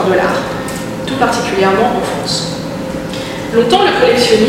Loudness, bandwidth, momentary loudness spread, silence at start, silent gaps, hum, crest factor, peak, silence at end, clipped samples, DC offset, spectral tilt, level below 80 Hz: -14 LUFS; 16.5 kHz; 11 LU; 0 s; none; none; 12 dB; 0 dBFS; 0 s; under 0.1%; under 0.1%; -4.5 dB/octave; -38 dBFS